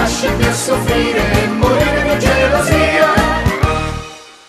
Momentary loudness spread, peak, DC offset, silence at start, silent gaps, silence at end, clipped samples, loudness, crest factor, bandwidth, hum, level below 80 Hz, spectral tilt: 5 LU; 0 dBFS; under 0.1%; 0 s; none; 0.2 s; under 0.1%; -13 LUFS; 14 dB; 14 kHz; none; -24 dBFS; -5 dB/octave